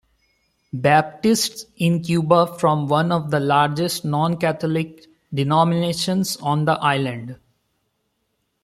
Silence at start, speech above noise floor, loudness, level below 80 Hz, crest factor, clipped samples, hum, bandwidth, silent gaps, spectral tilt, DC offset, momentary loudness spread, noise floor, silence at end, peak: 0.75 s; 52 dB; -20 LUFS; -60 dBFS; 18 dB; under 0.1%; none; 15.5 kHz; none; -5.5 dB/octave; under 0.1%; 8 LU; -72 dBFS; 1.3 s; -2 dBFS